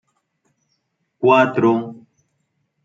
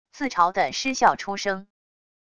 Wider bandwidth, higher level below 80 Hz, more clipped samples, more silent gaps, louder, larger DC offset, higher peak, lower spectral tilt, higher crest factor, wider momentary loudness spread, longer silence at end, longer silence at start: second, 7.4 kHz vs 11 kHz; second, -70 dBFS vs -60 dBFS; neither; neither; first, -16 LUFS vs -23 LUFS; neither; about the same, -2 dBFS vs -4 dBFS; first, -7.5 dB/octave vs -2.5 dB/octave; about the same, 20 dB vs 22 dB; about the same, 10 LU vs 8 LU; first, 0.9 s vs 0.75 s; first, 1.2 s vs 0.15 s